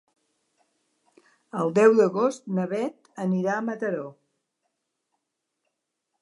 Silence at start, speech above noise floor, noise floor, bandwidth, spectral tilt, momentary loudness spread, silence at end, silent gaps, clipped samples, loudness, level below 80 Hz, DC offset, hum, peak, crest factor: 1.55 s; 58 dB; -81 dBFS; 11 kHz; -7 dB/octave; 15 LU; 2.1 s; none; under 0.1%; -24 LUFS; -82 dBFS; under 0.1%; none; -4 dBFS; 22 dB